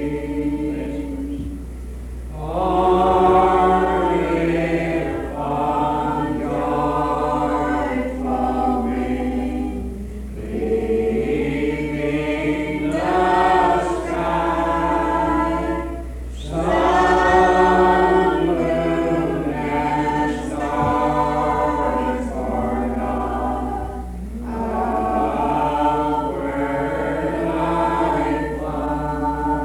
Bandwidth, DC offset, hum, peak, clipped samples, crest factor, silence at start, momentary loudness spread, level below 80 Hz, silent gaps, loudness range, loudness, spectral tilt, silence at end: 13.5 kHz; under 0.1%; none; -6 dBFS; under 0.1%; 14 dB; 0 s; 12 LU; -32 dBFS; none; 6 LU; -20 LUFS; -7 dB/octave; 0 s